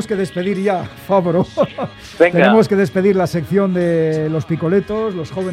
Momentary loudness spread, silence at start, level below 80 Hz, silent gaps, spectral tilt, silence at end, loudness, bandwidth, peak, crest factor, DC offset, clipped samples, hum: 9 LU; 0 s; -50 dBFS; none; -7 dB/octave; 0 s; -16 LUFS; 14.5 kHz; 0 dBFS; 16 dB; under 0.1%; under 0.1%; none